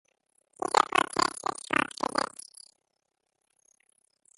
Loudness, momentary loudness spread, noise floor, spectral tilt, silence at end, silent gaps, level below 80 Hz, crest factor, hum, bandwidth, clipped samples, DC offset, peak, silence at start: -28 LUFS; 13 LU; -80 dBFS; -2 dB/octave; 2.1 s; none; -68 dBFS; 28 dB; none; 12 kHz; under 0.1%; under 0.1%; -4 dBFS; 0.6 s